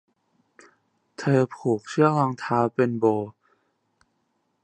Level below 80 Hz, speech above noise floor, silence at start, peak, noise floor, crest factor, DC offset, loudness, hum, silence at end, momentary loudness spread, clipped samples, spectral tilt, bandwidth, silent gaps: -68 dBFS; 50 dB; 1.2 s; -4 dBFS; -73 dBFS; 22 dB; under 0.1%; -23 LUFS; none; 1.35 s; 8 LU; under 0.1%; -7.5 dB/octave; 9.6 kHz; none